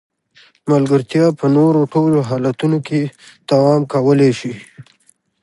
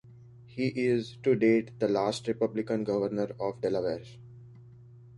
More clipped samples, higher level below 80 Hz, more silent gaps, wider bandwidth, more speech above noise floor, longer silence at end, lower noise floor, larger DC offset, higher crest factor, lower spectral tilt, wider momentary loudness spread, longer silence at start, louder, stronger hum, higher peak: neither; first, -60 dBFS vs -66 dBFS; neither; about the same, 11.5 kHz vs 11.5 kHz; first, 42 dB vs 23 dB; first, 0.6 s vs 0 s; first, -57 dBFS vs -52 dBFS; neither; about the same, 14 dB vs 18 dB; first, -8 dB/octave vs -6.5 dB/octave; first, 13 LU vs 9 LU; first, 0.65 s vs 0.05 s; first, -15 LUFS vs -29 LUFS; neither; first, -2 dBFS vs -14 dBFS